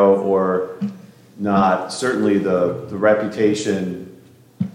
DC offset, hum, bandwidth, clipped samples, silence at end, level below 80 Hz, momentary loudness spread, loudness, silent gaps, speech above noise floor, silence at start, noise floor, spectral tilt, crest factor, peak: under 0.1%; none; 13.5 kHz; under 0.1%; 0.05 s; -62 dBFS; 11 LU; -19 LUFS; none; 27 dB; 0 s; -46 dBFS; -6 dB/octave; 16 dB; -2 dBFS